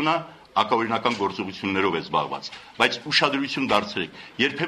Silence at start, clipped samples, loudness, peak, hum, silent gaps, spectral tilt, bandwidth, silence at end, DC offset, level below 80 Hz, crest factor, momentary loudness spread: 0 s; under 0.1%; -24 LUFS; -2 dBFS; none; none; -4 dB/octave; 13.5 kHz; 0 s; under 0.1%; -62 dBFS; 22 dB; 10 LU